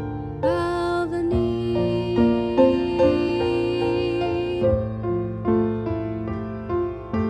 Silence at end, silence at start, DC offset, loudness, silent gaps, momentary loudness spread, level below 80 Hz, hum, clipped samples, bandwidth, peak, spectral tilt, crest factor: 0 s; 0 s; under 0.1%; -23 LUFS; none; 8 LU; -42 dBFS; none; under 0.1%; 9.6 kHz; -4 dBFS; -8 dB/octave; 18 dB